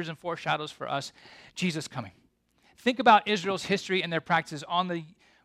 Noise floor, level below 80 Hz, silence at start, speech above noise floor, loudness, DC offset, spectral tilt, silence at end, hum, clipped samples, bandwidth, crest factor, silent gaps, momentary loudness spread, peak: -66 dBFS; -70 dBFS; 0 s; 37 dB; -28 LUFS; under 0.1%; -4.5 dB/octave; 0.35 s; none; under 0.1%; 14 kHz; 22 dB; none; 17 LU; -6 dBFS